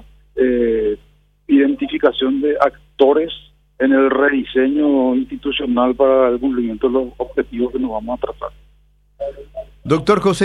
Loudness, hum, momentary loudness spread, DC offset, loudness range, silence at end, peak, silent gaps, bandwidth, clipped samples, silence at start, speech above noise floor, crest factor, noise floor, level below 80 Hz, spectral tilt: -17 LUFS; none; 15 LU; under 0.1%; 6 LU; 0 s; 0 dBFS; none; 11 kHz; under 0.1%; 0.35 s; 37 dB; 16 dB; -53 dBFS; -44 dBFS; -6 dB/octave